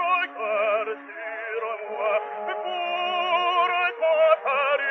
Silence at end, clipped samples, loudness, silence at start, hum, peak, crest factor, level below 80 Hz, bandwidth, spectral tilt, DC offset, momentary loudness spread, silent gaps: 0 s; under 0.1%; -24 LUFS; 0 s; none; -6 dBFS; 18 dB; under -90 dBFS; 6.2 kHz; 2.5 dB/octave; under 0.1%; 11 LU; none